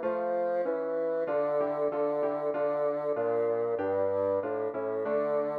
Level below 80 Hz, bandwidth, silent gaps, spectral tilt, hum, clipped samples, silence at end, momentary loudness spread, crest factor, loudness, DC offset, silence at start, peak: -76 dBFS; 4.7 kHz; none; -9 dB/octave; none; under 0.1%; 0 s; 2 LU; 10 dB; -30 LUFS; under 0.1%; 0 s; -18 dBFS